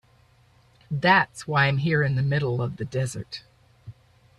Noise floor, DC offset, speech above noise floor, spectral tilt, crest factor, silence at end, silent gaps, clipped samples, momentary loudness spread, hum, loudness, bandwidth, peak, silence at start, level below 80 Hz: -59 dBFS; under 0.1%; 35 dB; -6 dB/octave; 20 dB; 0.5 s; none; under 0.1%; 15 LU; none; -23 LUFS; 12 kHz; -6 dBFS; 0.9 s; -56 dBFS